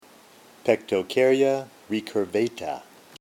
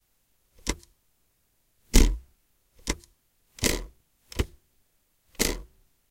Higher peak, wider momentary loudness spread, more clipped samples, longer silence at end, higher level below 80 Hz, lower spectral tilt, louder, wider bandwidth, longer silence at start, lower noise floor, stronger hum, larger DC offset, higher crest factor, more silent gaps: second, -6 dBFS vs -2 dBFS; second, 12 LU vs 17 LU; neither; about the same, 0.4 s vs 0.5 s; second, -70 dBFS vs -32 dBFS; first, -5 dB/octave vs -3.5 dB/octave; first, -25 LUFS vs -30 LUFS; about the same, 16.5 kHz vs 17 kHz; about the same, 0.65 s vs 0.65 s; second, -52 dBFS vs -70 dBFS; neither; neither; second, 20 dB vs 28 dB; neither